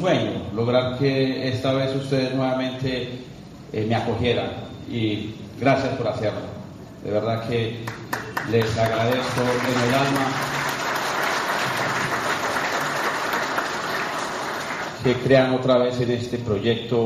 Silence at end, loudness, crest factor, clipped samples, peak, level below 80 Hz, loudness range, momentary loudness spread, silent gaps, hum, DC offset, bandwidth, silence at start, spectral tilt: 0 s; -23 LUFS; 20 dB; under 0.1%; -4 dBFS; -52 dBFS; 3 LU; 10 LU; none; none; under 0.1%; 14.5 kHz; 0 s; -5 dB/octave